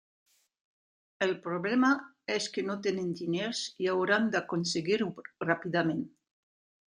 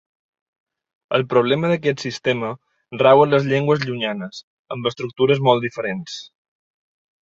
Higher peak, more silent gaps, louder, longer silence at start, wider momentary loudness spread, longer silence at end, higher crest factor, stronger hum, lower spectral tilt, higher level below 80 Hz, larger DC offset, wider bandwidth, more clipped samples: second, -10 dBFS vs -2 dBFS; second, none vs 4.43-4.65 s; second, -31 LUFS vs -19 LUFS; about the same, 1.2 s vs 1.1 s; second, 7 LU vs 19 LU; about the same, 0.9 s vs 0.95 s; about the same, 22 dB vs 18 dB; neither; second, -4.5 dB/octave vs -6 dB/octave; second, -76 dBFS vs -62 dBFS; neither; first, 10.5 kHz vs 7.8 kHz; neither